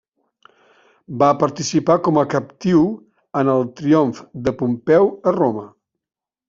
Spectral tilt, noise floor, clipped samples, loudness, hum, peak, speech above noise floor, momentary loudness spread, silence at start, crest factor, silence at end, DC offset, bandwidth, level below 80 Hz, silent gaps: -6.5 dB/octave; -55 dBFS; under 0.1%; -18 LUFS; none; -2 dBFS; 38 dB; 9 LU; 1.1 s; 16 dB; 0.8 s; under 0.1%; 7.6 kHz; -56 dBFS; none